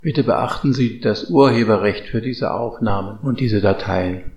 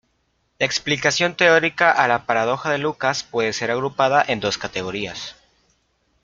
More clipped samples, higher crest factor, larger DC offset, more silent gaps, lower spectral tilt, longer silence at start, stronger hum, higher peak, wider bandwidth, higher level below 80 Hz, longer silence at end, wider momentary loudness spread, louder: neither; about the same, 18 dB vs 20 dB; neither; neither; first, -7.5 dB/octave vs -3.5 dB/octave; second, 0 s vs 0.6 s; neither; about the same, 0 dBFS vs -2 dBFS; first, 11 kHz vs 7.8 kHz; first, -42 dBFS vs -58 dBFS; second, 0 s vs 0.9 s; about the same, 9 LU vs 11 LU; about the same, -18 LUFS vs -19 LUFS